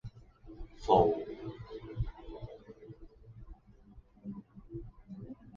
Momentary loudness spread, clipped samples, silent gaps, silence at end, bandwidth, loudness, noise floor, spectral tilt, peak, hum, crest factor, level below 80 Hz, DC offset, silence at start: 28 LU; under 0.1%; none; 0 s; 7.2 kHz; -33 LUFS; -58 dBFS; -7 dB/octave; -12 dBFS; none; 26 dB; -50 dBFS; under 0.1%; 0.05 s